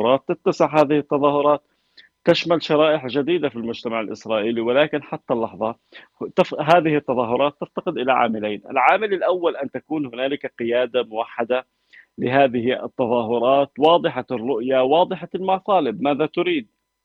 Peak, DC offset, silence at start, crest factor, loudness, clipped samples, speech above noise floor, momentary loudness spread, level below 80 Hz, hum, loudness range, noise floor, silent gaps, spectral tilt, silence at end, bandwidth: -2 dBFS; under 0.1%; 0 s; 18 dB; -20 LUFS; under 0.1%; 34 dB; 9 LU; -64 dBFS; none; 4 LU; -54 dBFS; none; -6.5 dB/octave; 0.4 s; 7.6 kHz